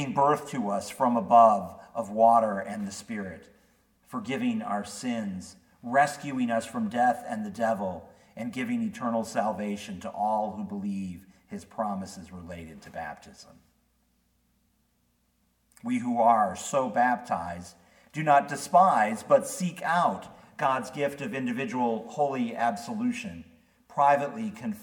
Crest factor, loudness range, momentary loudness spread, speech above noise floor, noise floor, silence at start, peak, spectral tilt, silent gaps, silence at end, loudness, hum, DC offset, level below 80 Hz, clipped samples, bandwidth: 22 dB; 13 LU; 18 LU; 44 dB; -71 dBFS; 0 s; -6 dBFS; -5.5 dB/octave; none; 0 s; -27 LUFS; none; under 0.1%; -68 dBFS; under 0.1%; 18 kHz